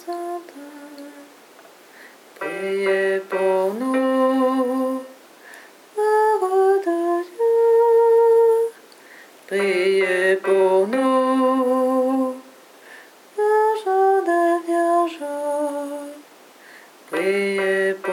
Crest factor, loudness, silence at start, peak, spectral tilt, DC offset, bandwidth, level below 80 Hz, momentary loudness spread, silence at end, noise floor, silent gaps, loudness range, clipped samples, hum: 12 dB; -19 LUFS; 0.05 s; -8 dBFS; -5 dB/octave; under 0.1%; 16.5 kHz; under -90 dBFS; 15 LU; 0 s; -47 dBFS; none; 6 LU; under 0.1%; none